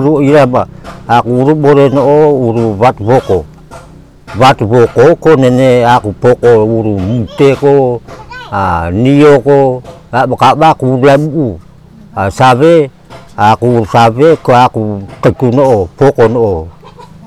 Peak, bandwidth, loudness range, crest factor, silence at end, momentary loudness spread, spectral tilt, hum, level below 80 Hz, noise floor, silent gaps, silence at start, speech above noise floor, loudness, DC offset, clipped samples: 0 dBFS; 13 kHz; 2 LU; 8 dB; 0.2 s; 11 LU; -7.5 dB/octave; none; -36 dBFS; -35 dBFS; none; 0 s; 27 dB; -8 LUFS; 0.3%; 2%